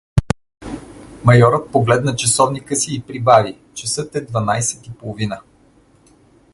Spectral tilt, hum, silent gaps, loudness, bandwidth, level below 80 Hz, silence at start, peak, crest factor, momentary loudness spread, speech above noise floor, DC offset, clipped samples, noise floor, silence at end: -4.5 dB/octave; none; none; -17 LUFS; 11.5 kHz; -38 dBFS; 0.15 s; 0 dBFS; 18 dB; 18 LU; 36 dB; under 0.1%; under 0.1%; -52 dBFS; 1.15 s